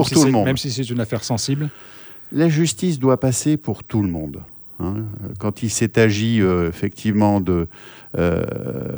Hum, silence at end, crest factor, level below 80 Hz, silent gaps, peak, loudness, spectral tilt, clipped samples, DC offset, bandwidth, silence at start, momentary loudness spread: none; 0 s; 18 dB; -44 dBFS; none; -2 dBFS; -20 LUFS; -5.5 dB/octave; under 0.1%; under 0.1%; over 20 kHz; 0 s; 13 LU